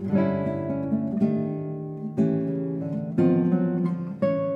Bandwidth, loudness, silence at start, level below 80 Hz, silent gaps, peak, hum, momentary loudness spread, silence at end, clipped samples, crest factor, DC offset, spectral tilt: 5.2 kHz; -26 LUFS; 0 s; -64 dBFS; none; -10 dBFS; none; 8 LU; 0 s; under 0.1%; 14 dB; under 0.1%; -11 dB/octave